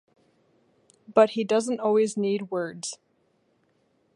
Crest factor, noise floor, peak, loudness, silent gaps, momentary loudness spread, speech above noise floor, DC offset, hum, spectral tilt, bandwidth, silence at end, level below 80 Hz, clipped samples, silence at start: 22 dB; -68 dBFS; -6 dBFS; -25 LUFS; none; 14 LU; 44 dB; under 0.1%; none; -4.5 dB/octave; 11.5 kHz; 1.2 s; -80 dBFS; under 0.1%; 1.1 s